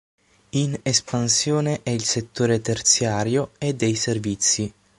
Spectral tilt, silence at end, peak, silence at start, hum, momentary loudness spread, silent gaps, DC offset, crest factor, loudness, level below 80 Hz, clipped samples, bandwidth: -3.5 dB/octave; 0.3 s; -4 dBFS; 0.55 s; none; 6 LU; none; under 0.1%; 18 dB; -21 LUFS; -54 dBFS; under 0.1%; 11.5 kHz